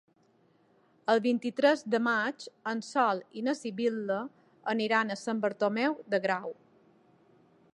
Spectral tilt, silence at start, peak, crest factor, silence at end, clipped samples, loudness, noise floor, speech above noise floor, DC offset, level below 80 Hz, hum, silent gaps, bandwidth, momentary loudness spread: -5 dB/octave; 1.1 s; -12 dBFS; 20 dB; 1.2 s; under 0.1%; -30 LUFS; -67 dBFS; 37 dB; under 0.1%; -84 dBFS; none; none; 11 kHz; 9 LU